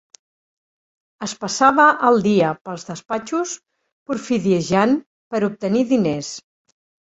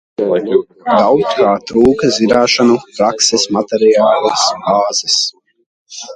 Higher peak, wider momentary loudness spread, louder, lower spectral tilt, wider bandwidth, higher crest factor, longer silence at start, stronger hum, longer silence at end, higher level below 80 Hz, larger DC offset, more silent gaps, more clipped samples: about the same, -2 dBFS vs 0 dBFS; first, 17 LU vs 6 LU; second, -19 LUFS vs -12 LUFS; first, -5 dB/octave vs -3 dB/octave; second, 8.2 kHz vs 11 kHz; first, 18 dB vs 12 dB; first, 1.2 s vs 0.2 s; neither; first, 0.65 s vs 0 s; second, -60 dBFS vs -46 dBFS; neither; first, 2.61-2.65 s, 3.92-4.06 s, 5.06-5.31 s vs 5.66-5.86 s; neither